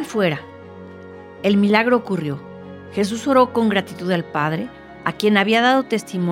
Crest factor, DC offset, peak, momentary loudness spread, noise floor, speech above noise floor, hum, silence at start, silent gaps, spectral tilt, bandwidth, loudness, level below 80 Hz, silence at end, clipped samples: 18 dB; under 0.1%; -2 dBFS; 23 LU; -38 dBFS; 20 dB; none; 0 s; none; -5.5 dB/octave; 15.5 kHz; -19 LUFS; -60 dBFS; 0 s; under 0.1%